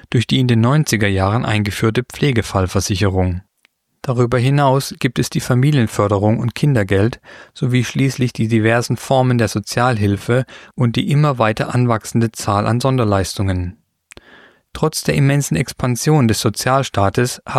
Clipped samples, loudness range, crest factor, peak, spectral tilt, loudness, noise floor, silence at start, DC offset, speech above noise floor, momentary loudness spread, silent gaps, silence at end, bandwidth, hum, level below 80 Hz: under 0.1%; 2 LU; 16 dB; -2 dBFS; -6 dB/octave; -16 LUFS; -61 dBFS; 0.1 s; under 0.1%; 45 dB; 6 LU; none; 0 s; 15 kHz; none; -42 dBFS